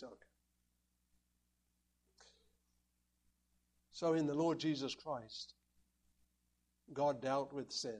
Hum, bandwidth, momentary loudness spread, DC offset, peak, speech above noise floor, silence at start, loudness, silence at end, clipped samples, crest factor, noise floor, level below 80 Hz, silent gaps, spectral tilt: 60 Hz at -75 dBFS; 11 kHz; 15 LU; under 0.1%; -24 dBFS; 43 dB; 0 s; -39 LUFS; 0 s; under 0.1%; 20 dB; -82 dBFS; -80 dBFS; none; -5 dB/octave